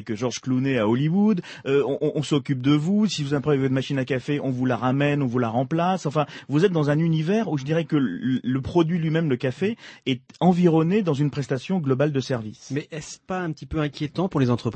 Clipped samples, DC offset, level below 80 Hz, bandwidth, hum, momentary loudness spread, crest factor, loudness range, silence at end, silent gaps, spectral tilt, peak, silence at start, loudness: under 0.1%; under 0.1%; -54 dBFS; 8.6 kHz; none; 8 LU; 16 dB; 2 LU; 0 s; none; -7 dB/octave; -6 dBFS; 0 s; -23 LUFS